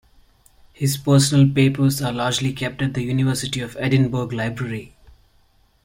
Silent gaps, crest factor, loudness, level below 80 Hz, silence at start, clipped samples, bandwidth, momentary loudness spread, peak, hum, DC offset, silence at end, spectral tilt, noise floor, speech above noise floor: none; 16 dB; -20 LUFS; -50 dBFS; 0.8 s; under 0.1%; 16.5 kHz; 10 LU; -4 dBFS; none; under 0.1%; 0.95 s; -5.5 dB/octave; -58 dBFS; 38 dB